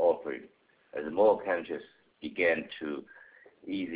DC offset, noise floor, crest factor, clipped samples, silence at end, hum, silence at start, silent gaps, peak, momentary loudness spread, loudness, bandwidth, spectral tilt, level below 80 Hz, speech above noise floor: under 0.1%; -60 dBFS; 18 dB; under 0.1%; 0 s; none; 0 s; none; -14 dBFS; 17 LU; -31 LUFS; 4 kHz; -8.5 dB/octave; -70 dBFS; 30 dB